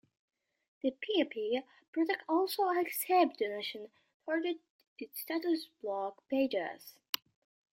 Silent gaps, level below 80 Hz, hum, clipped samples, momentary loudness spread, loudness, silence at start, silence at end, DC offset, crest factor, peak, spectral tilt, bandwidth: 1.88-1.93 s, 4.14-4.20 s, 4.70-4.79 s, 4.87-4.96 s; -86 dBFS; none; under 0.1%; 13 LU; -34 LUFS; 0.85 s; 0.85 s; under 0.1%; 22 dB; -12 dBFS; -2.5 dB/octave; 16 kHz